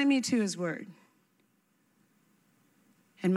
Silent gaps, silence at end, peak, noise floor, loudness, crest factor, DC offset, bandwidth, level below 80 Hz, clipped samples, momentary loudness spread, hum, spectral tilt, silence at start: none; 0 s; -14 dBFS; -72 dBFS; -31 LUFS; 18 dB; under 0.1%; 13 kHz; -86 dBFS; under 0.1%; 16 LU; none; -5 dB/octave; 0 s